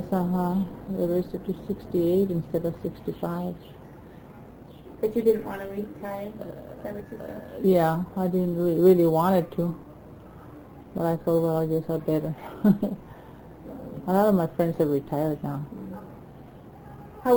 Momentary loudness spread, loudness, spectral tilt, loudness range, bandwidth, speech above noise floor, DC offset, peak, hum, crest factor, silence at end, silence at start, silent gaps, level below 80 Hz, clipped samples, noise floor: 24 LU; -26 LUFS; -9 dB/octave; 7 LU; over 20 kHz; 21 dB; under 0.1%; -8 dBFS; none; 18 dB; 0 s; 0 s; none; -54 dBFS; under 0.1%; -46 dBFS